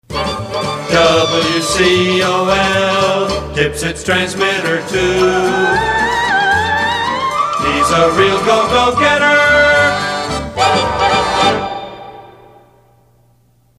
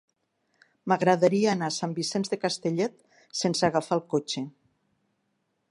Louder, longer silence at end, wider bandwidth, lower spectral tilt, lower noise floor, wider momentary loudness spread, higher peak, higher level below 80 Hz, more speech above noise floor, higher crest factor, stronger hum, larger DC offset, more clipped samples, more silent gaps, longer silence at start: first, -13 LUFS vs -27 LUFS; first, 1.5 s vs 1.2 s; first, 15.5 kHz vs 11.5 kHz; about the same, -3.5 dB/octave vs -4.5 dB/octave; second, -53 dBFS vs -76 dBFS; second, 9 LU vs 12 LU; first, 0 dBFS vs -8 dBFS; first, -36 dBFS vs -72 dBFS; second, 40 dB vs 50 dB; second, 14 dB vs 20 dB; neither; neither; neither; neither; second, 0.1 s vs 0.85 s